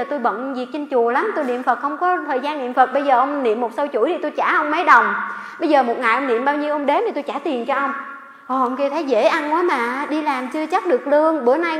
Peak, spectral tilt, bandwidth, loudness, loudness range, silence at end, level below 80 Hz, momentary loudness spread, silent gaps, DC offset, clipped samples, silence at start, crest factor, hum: 0 dBFS; -4 dB/octave; 12.5 kHz; -19 LUFS; 3 LU; 0 s; -76 dBFS; 8 LU; none; under 0.1%; under 0.1%; 0 s; 18 dB; none